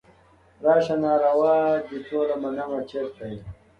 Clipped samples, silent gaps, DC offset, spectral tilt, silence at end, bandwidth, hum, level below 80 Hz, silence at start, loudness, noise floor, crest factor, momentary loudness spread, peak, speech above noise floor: under 0.1%; none; under 0.1%; -7.5 dB/octave; 0.25 s; 7 kHz; none; -58 dBFS; 0.6 s; -23 LUFS; -56 dBFS; 16 dB; 13 LU; -8 dBFS; 33 dB